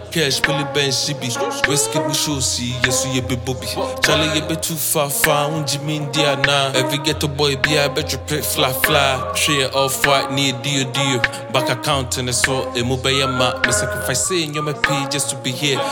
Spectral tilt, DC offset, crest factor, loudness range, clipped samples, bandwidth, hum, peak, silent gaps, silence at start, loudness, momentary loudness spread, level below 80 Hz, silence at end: -3 dB/octave; under 0.1%; 18 dB; 2 LU; under 0.1%; 17.5 kHz; none; -2 dBFS; none; 0 s; -18 LUFS; 5 LU; -44 dBFS; 0 s